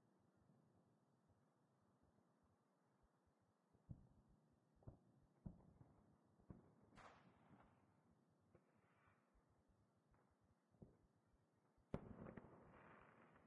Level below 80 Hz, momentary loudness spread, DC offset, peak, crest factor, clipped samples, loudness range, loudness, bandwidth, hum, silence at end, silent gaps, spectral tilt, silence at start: -78 dBFS; 11 LU; under 0.1%; -32 dBFS; 36 dB; under 0.1%; 5 LU; -63 LUFS; 3.5 kHz; none; 0 s; none; -6 dB/octave; 0 s